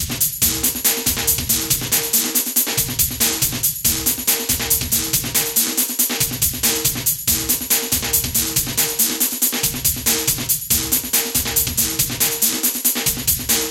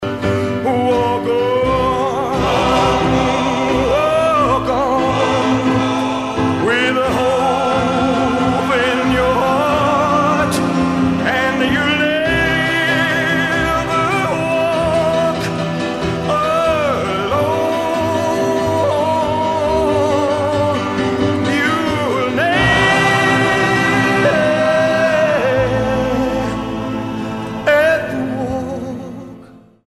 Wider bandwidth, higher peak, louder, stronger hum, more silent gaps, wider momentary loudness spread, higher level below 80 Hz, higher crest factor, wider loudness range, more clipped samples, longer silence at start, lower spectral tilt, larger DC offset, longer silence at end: first, 17.5 kHz vs 14.5 kHz; about the same, -2 dBFS vs 0 dBFS; about the same, -16 LUFS vs -15 LUFS; neither; neither; second, 2 LU vs 6 LU; about the same, -38 dBFS vs -36 dBFS; about the same, 18 dB vs 16 dB; second, 0 LU vs 3 LU; neither; about the same, 0 s vs 0 s; second, -1.5 dB/octave vs -5.5 dB/octave; neither; second, 0 s vs 0.3 s